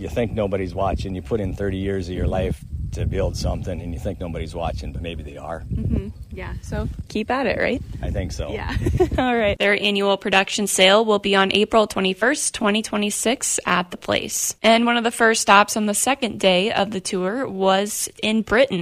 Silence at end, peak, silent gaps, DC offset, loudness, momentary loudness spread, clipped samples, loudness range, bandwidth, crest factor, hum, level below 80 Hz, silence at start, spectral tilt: 0 s; 0 dBFS; none; under 0.1%; -20 LUFS; 12 LU; under 0.1%; 10 LU; 16 kHz; 20 dB; none; -34 dBFS; 0 s; -3.5 dB/octave